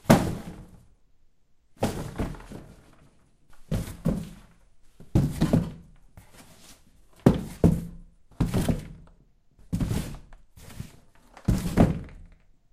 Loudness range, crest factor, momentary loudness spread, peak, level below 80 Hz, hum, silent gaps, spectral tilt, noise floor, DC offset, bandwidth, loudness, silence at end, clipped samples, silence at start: 8 LU; 28 dB; 22 LU; -2 dBFS; -38 dBFS; none; none; -7 dB/octave; -60 dBFS; under 0.1%; 15.5 kHz; -27 LUFS; 0.45 s; under 0.1%; 0.05 s